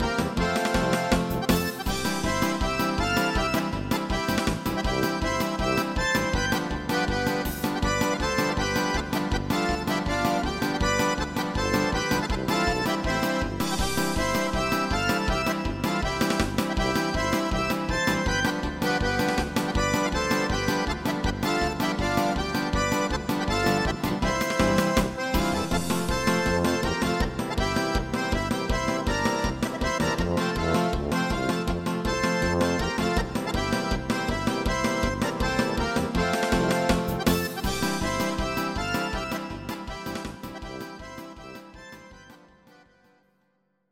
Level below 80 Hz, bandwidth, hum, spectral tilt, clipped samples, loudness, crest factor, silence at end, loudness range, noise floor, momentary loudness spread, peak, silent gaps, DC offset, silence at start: -36 dBFS; 17 kHz; none; -4.5 dB/octave; under 0.1%; -26 LUFS; 18 dB; 1.55 s; 2 LU; -71 dBFS; 4 LU; -8 dBFS; none; under 0.1%; 0 s